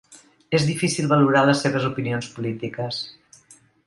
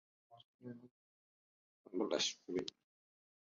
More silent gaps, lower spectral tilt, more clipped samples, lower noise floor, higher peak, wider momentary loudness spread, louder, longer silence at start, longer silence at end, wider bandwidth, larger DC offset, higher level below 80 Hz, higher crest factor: second, none vs 0.45-0.59 s, 0.91-1.84 s; first, -5.5 dB/octave vs -2 dB/octave; neither; second, -54 dBFS vs under -90 dBFS; first, -4 dBFS vs -22 dBFS; second, 12 LU vs 19 LU; first, -22 LUFS vs -40 LUFS; second, 0.1 s vs 0.3 s; about the same, 0.75 s vs 0.7 s; first, 11.5 kHz vs 7.4 kHz; neither; first, -60 dBFS vs -84 dBFS; second, 18 dB vs 24 dB